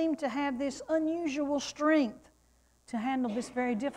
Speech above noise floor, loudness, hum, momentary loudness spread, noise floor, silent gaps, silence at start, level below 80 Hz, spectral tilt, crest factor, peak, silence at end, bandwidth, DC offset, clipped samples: 36 dB; -32 LUFS; none; 8 LU; -67 dBFS; none; 0 s; -66 dBFS; -4.5 dB/octave; 16 dB; -16 dBFS; 0 s; 11 kHz; under 0.1%; under 0.1%